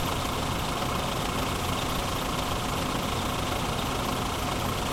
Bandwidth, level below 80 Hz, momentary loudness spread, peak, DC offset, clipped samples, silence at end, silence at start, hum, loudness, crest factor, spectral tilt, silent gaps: 16.5 kHz; -40 dBFS; 0 LU; -4 dBFS; under 0.1%; under 0.1%; 0 s; 0 s; none; -29 LUFS; 24 dB; -4 dB/octave; none